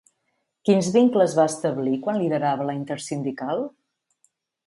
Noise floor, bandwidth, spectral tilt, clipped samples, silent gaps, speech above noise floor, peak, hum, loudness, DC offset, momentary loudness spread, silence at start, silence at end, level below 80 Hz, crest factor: -75 dBFS; 11.5 kHz; -6 dB/octave; under 0.1%; none; 53 dB; -6 dBFS; none; -23 LUFS; under 0.1%; 11 LU; 0.65 s; 1 s; -70 dBFS; 18 dB